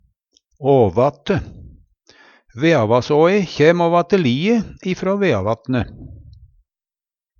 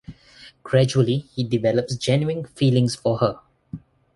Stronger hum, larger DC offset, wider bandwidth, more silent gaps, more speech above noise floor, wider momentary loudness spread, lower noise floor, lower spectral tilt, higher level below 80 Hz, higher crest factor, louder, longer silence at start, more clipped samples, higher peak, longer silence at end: neither; neither; second, 7.2 kHz vs 11.5 kHz; neither; first, over 74 dB vs 28 dB; second, 9 LU vs 21 LU; first, under -90 dBFS vs -49 dBFS; about the same, -7 dB/octave vs -6.5 dB/octave; first, -46 dBFS vs -54 dBFS; about the same, 18 dB vs 18 dB; first, -17 LUFS vs -21 LUFS; first, 0.6 s vs 0.1 s; neither; first, 0 dBFS vs -4 dBFS; first, 1.2 s vs 0.35 s